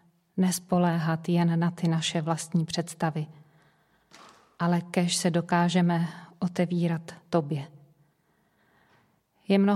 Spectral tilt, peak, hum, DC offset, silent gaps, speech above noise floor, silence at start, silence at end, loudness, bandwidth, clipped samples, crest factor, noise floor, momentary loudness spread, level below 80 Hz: -5.5 dB/octave; -10 dBFS; none; under 0.1%; none; 43 dB; 0.35 s; 0 s; -27 LUFS; 14 kHz; under 0.1%; 18 dB; -69 dBFS; 10 LU; -70 dBFS